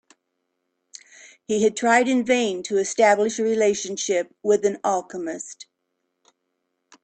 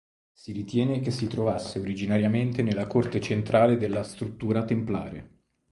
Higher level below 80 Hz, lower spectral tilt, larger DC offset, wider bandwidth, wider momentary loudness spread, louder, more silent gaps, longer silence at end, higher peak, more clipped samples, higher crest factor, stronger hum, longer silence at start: second, -68 dBFS vs -54 dBFS; second, -3 dB/octave vs -7.5 dB/octave; neither; second, 9.2 kHz vs 11.5 kHz; about the same, 13 LU vs 13 LU; first, -21 LUFS vs -27 LUFS; neither; first, 1.4 s vs 0.45 s; first, -4 dBFS vs -8 dBFS; neither; about the same, 18 dB vs 18 dB; neither; first, 1.5 s vs 0.45 s